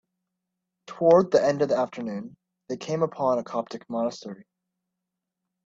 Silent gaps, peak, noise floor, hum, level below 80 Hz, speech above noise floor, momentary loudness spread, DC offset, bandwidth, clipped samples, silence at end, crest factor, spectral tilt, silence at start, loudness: none; -6 dBFS; -85 dBFS; none; -70 dBFS; 60 dB; 21 LU; under 0.1%; 7.8 kHz; under 0.1%; 1.3 s; 22 dB; -6.5 dB/octave; 0.9 s; -25 LUFS